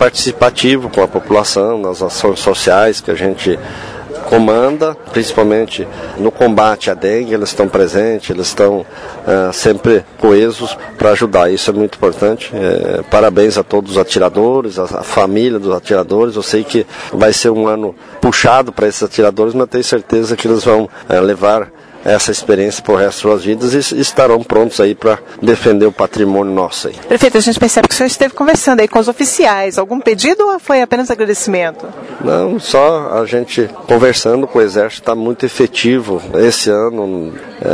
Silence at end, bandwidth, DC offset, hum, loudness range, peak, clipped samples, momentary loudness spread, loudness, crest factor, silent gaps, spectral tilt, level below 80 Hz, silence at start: 0 s; 11 kHz; under 0.1%; none; 2 LU; 0 dBFS; 0.4%; 7 LU; -12 LUFS; 12 dB; none; -4 dB/octave; -42 dBFS; 0 s